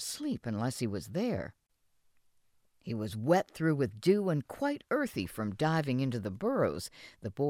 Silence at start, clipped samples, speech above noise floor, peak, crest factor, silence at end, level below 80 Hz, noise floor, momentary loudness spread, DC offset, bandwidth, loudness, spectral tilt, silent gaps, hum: 0 s; under 0.1%; 39 dB; -14 dBFS; 20 dB; 0 s; -64 dBFS; -71 dBFS; 12 LU; under 0.1%; 16 kHz; -33 LUFS; -6 dB/octave; none; none